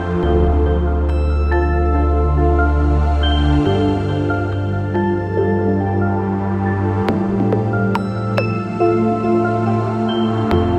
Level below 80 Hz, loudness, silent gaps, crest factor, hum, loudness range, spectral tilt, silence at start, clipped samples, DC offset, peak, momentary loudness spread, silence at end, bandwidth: -22 dBFS; -17 LUFS; none; 14 dB; none; 2 LU; -9 dB/octave; 0 s; under 0.1%; under 0.1%; -2 dBFS; 4 LU; 0 s; 5.6 kHz